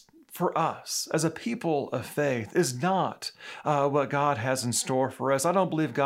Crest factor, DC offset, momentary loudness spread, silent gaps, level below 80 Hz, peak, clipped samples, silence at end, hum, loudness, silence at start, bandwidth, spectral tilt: 16 dB; under 0.1%; 7 LU; none; -74 dBFS; -10 dBFS; under 0.1%; 0 s; none; -28 LUFS; 0.3 s; 16 kHz; -4.5 dB/octave